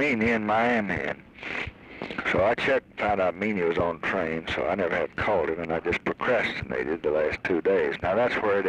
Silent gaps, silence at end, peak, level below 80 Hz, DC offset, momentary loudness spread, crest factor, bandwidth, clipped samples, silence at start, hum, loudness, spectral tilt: none; 0 s; -12 dBFS; -50 dBFS; under 0.1%; 9 LU; 14 dB; 10 kHz; under 0.1%; 0 s; none; -26 LUFS; -6.5 dB/octave